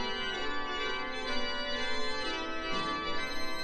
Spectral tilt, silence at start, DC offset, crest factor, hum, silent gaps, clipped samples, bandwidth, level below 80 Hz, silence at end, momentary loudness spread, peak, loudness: -2.5 dB/octave; 0 s; under 0.1%; 14 dB; none; none; under 0.1%; 12.5 kHz; -46 dBFS; 0 s; 2 LU; -18 dBFS; -34 LUFS